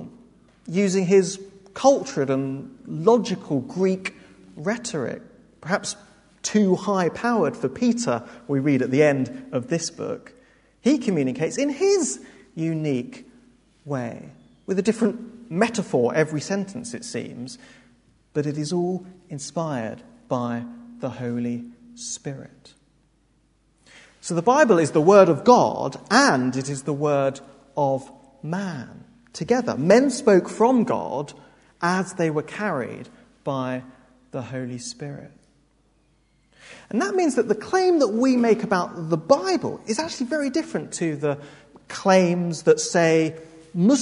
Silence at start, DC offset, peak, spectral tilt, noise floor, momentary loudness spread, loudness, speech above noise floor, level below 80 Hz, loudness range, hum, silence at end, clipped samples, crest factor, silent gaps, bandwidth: 0 s; under 0.1%; 0 dBFS; -5.5 dB/octave; -63 dBFS; 17 LU; -22 LUFS; 41 dB; -64 dBFS; 11 LU; none; 0 s; under 0.1%; 22 dB; none; 11 kHz